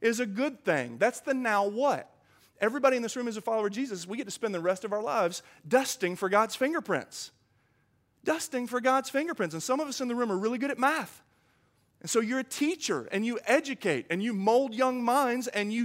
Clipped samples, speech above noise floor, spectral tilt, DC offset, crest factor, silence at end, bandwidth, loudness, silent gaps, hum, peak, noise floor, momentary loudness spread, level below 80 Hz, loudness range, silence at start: under 0.1%; 41 dB; -4 dB/octave; under 0.1%; 20 dB; 0 s; 16 kHz; -29 LUFS; none; none; -10 dBFS; -70 dBFS; 7 LU; -80 dBFS; 3 LU; 0 s